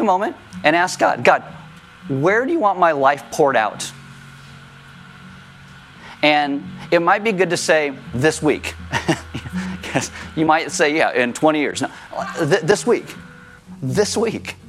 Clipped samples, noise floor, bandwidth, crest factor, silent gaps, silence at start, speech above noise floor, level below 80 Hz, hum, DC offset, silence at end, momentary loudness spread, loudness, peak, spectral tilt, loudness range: under 0.1%; -42 dBFS; 15 kHz; 20 dB; none; 0 s; 24 dB; -54 dBFS; none; under 0.1%; 0 s; 12 LU; -18 LUFS; 0 dBFS; -4.5 dB/octave; 4 LU